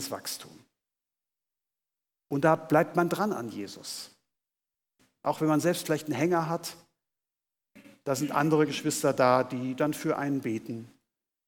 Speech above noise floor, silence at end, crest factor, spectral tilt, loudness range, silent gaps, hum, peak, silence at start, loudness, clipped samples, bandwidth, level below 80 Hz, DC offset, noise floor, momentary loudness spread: over 62 dB; 0.6 s; 22 dB; -5 dB/octave; 3 LU; none; none; -10 dBFS; 0 s; -28 LUFS; under 0.1%; 19 kHz; -78 dBFS; under 0.1%; under -90 dBFS; 14 LU